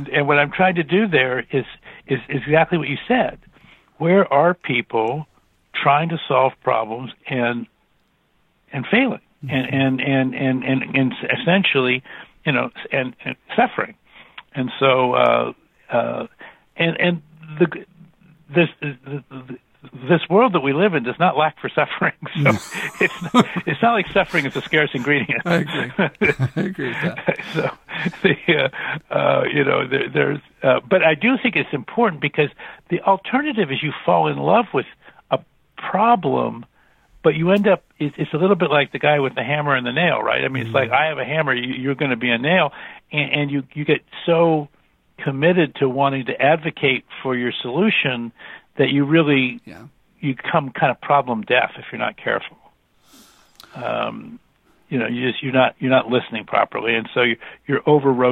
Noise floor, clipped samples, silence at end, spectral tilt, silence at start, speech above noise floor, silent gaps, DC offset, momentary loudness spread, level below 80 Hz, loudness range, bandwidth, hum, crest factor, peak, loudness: -63 dBFS; under 0.1%; 0 s; -7 dB/octave; 0 s; 44 dB; none; under 0.1%; 11 LU; -58 dBFS; 4 LU; 13 kHz; none; 20 dB; 0 dBFS; -19 LUFS